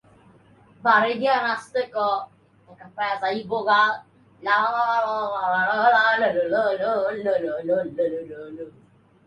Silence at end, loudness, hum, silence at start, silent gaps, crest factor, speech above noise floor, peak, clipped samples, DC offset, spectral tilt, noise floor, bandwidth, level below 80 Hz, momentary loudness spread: 0.55 s; -22 LUFS; none; 0.85 s; none; 18 dB; 31 dB; -4 dBFS; under 0.1%; under 0.1%; -5 dB/octave; -54 dBFS; 11 kHz; -70 dBFS; 15 LU